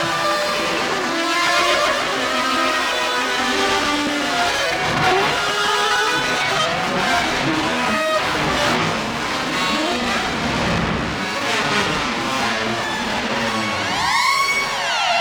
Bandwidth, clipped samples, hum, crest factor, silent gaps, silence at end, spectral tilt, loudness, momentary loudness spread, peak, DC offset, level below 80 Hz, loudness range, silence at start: over 20 kHz; under 0.1%; none; 16 dB; none; 0 s; -3 dB/octave; -18 LUFS; 4 LU; -4 dBFS; under 0.1%; -44 dBFS; 2 LU; 0 s